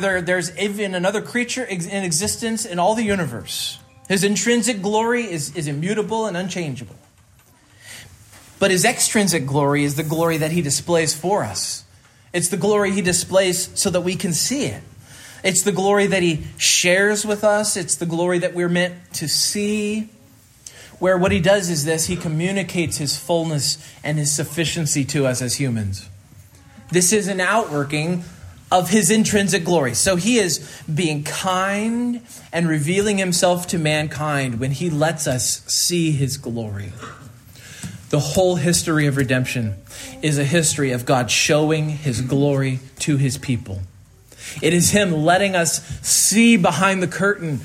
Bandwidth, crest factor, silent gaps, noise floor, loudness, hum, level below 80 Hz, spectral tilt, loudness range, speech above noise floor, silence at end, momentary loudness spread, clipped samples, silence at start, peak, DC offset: 16 kHz; 18 dB; none; -52 dBFS; -19 LUFS; none; -52 dBFS; -4 dB/octave; 4 LU; 33 dB; 0 s; 11 LU; under 0.1%; 0 s; -2 dBFS; under 0.1%